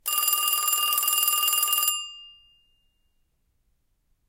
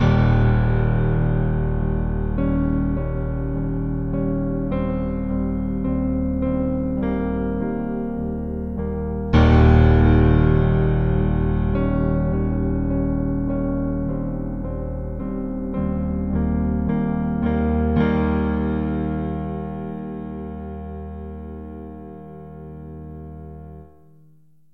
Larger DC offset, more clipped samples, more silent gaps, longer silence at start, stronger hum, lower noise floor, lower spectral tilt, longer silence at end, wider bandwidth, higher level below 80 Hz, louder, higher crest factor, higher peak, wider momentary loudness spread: second, under 0.1% vs 0.6%; neither; neither; about the same, 0.05 s vs 0 s; second, none vs 50 Hz at -55 dBFS; first, -70 dBFS vs -56 dBFS; second, 5 dB/octave vs -10.5 dB/octave; first, 2 s vs 0.85 s; first, 17.5 kHz vs 5.6 kHz; second, -70 dBFS vs -26 dBFS; about the same, -21 LUFS vs -22 LUFS; about the same, 22 dB vs 18 dB; about the same, -6 dBFS vs -4 dBFS; second, 5 LU vs 17 LU